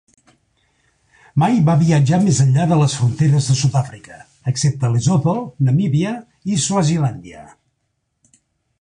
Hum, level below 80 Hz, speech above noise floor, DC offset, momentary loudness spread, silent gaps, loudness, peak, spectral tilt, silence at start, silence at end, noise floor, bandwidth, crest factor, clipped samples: none; -48 dBFS; 55 dB; under 0.1%; 10 LU; none; -17 LUFS; -4 dBFS; -6 dB/octave; 1.35 s; 1.4 s; -71 dBFS; 10.5 kHz; 14 dB; under 0.1%